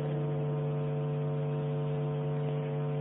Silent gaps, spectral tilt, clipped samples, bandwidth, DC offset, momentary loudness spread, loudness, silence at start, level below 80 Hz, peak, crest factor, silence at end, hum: none; -8.5 dB/octave; under 0.1%; 3.8 kHz; under 0.1%; 1 LU; -33 LUFS; 0 s; -62 dBFS; -22 dBFS; 10 dB; 0 s; none